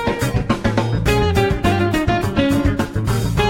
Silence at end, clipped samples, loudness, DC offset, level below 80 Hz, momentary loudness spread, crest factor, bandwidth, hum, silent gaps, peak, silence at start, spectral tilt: 0 s; under 0.1%; -18 LUFS; under 0.1%; -28 dBFS; 3 LU; 14 dB; 16.5 kHz; none; none; -2 dBFS; 0 s; -6 dB/octave